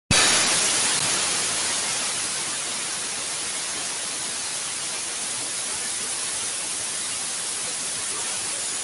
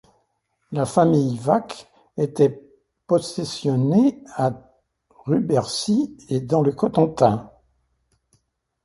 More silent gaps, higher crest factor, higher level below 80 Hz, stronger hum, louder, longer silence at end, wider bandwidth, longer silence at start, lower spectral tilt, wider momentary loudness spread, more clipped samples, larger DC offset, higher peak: neither; about the same, 20 dB vs 20 dB; about the same, -54 dBFS vs -58 dBFS; neither; about the same, -23 LUFS vs -21 LUFS; second, 0 s vs 1.4 s; about the same, 12 kHz vs 11.5 kHz; second, 0.1 s vs 0.7 s; second, 0 dB/octave vs -7 dB/octave; second, 8 LU vs 11 LU; neither; neither; second, -6 dBFS vs -2 dBFS